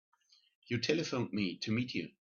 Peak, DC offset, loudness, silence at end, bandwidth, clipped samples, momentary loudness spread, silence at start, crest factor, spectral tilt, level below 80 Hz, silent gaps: -18 dBFS; under 0.1%; -35 LUFS; 0.2 s; 7.2 kHz; under 0.1%; 5 LU; 0.7 s; 20 dB; -4.5 dB/octave; -72 dBFS; none